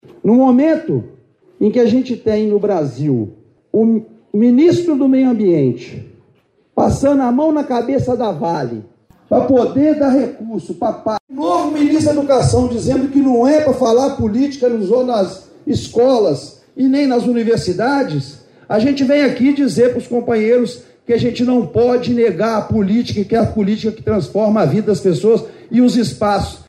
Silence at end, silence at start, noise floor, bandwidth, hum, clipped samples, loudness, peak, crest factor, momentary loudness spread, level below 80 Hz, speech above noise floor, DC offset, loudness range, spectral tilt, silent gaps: 0.1 s; 0.25 s; -56 dBFS; 11.5 kHz; none; under 0.1%; -15 LUFS; -2 dBFS; 12 dB; 9 LU; -42 dBFS; 42 dB; under 0.1%; 3 LU; -7 dB/octave; 11.20-11.28 s